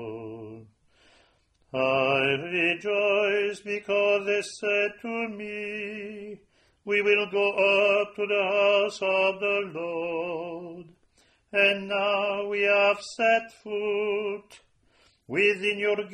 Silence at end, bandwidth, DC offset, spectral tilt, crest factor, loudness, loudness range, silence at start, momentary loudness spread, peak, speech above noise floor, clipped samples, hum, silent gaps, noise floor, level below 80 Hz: 0 s; 10 kHz; under 0.1%; -4 dB/octave; 18 dB; -25 LUFS; 4 LU; 0 s; 15 LU; -10 dBFS; 40 dB; under 0.1%; none; none; -65 dBFS; -70 dBFS